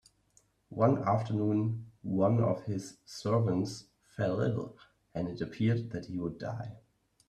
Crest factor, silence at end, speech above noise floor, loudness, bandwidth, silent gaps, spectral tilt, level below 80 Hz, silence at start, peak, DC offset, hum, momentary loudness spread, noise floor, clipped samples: 20 dB; 0.5 s; 38 dB; -32 LUFS; 10 kHz; none; -8 dB/octave; -64 dBFS; 0.7 s; -12 dBFS; under 0.1%; none; 15 LU; -69 dBFS; under 0.1%